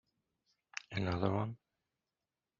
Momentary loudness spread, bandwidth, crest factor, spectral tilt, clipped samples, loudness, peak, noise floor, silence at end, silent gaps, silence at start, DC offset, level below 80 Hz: 13 LU; 7.2 kHz; 24 dB; -6 dB/octave; under 0.1%; -39 LUFS; -16 dBFS; under -90 dBFS; 1.05 s; none; 0.9 s; under 0.1%; -68 dBFS